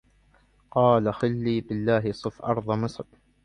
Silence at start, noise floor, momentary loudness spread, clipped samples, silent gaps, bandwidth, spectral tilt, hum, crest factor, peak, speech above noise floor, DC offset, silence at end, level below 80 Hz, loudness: 0.75 s; -61 dBFS; 11 LU; under 0.1%; none; 10 kHz; -8 dB/octave; none; 20 dB; -6 dBFS; 37 dB; under 0.1%; 0.45 s; -56 dBFS; -25 LUFS